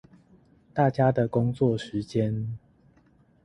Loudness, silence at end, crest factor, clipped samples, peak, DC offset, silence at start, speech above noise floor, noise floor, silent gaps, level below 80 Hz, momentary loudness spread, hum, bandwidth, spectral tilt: -26 LUFS; 0.85 s; 18 dB; under 0.1%; -8 dBFS; under 0.1%; 0.75 s; 36 dB; -61 dBFS; none; -58 dBFS; 12 LU; none; 9.6 kHz; -8.5 dB/octave